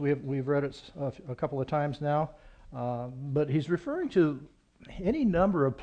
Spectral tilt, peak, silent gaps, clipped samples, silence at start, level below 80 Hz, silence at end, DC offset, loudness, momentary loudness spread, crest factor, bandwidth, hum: -9 dB/octave; -12 dBFS; none; under 0.1%; 0 s; -52 dBFS; 0 s; under 0.1%; -30 LUFS; 11 LU; 18 dB; 8.6 kHz; none